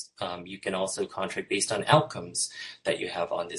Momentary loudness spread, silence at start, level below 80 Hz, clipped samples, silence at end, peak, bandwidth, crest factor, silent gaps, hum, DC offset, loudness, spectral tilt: 12 LU; 0 s; -64 dBFS; under 0.1%; 0 s; -4 dBFS; 11.5 kHz; 24 dB; none; none; under 0.1%; -29 LUFS; -3.5 dB/octave